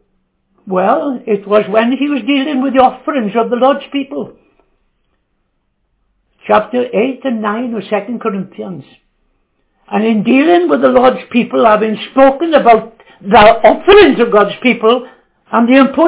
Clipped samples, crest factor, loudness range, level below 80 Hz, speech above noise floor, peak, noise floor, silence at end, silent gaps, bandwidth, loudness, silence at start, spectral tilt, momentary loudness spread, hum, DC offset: 1%; 12 dB; 10 LU; -44 dBFS; 53 dB; 0 dBFS; -64 dBFS; 0 s; none; 4 kHz; -11 LUFS; 0.65 s; -9.5 dB/octave; 13 LU; none; under 0.1%